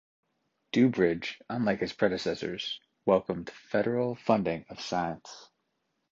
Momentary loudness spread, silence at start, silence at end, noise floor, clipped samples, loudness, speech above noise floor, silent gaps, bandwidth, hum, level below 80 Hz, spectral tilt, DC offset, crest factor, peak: 11 LU; 0.75 s; 0.65 s; -79 dBFS; under 0.1%; -30 LUFS; 50 dB; none; 7.6 kHz; none; -64 dBFS; -6 dB/octave; under 0.1%; 22 dB; -8 dBFS